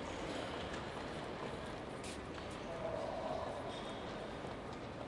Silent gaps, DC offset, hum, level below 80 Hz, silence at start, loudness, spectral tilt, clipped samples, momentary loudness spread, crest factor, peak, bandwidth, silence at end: none; under 0.1%; none; -60 dBFS; 0 s; -44 LUFS; -5 dB/octave; under 0.1%; 4 LU; 16 dB; -30 dBFS; 11.5 kHz; 0 s